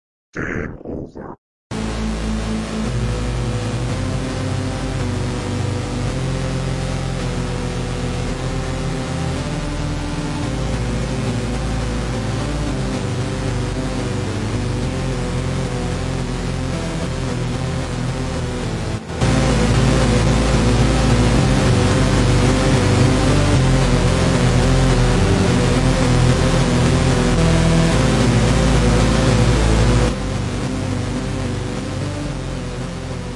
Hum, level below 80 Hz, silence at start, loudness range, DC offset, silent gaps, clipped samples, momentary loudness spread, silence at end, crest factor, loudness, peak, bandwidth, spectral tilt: none; -24 dBFS; 0.35 s; 8 LU; under 0.1%; 1.38-1.70 s; under 0.1%; 8 LU; 0 s; 14 dB; -19 LUFS; -2 dBFS; 11.5 kHz; -6 dB/octave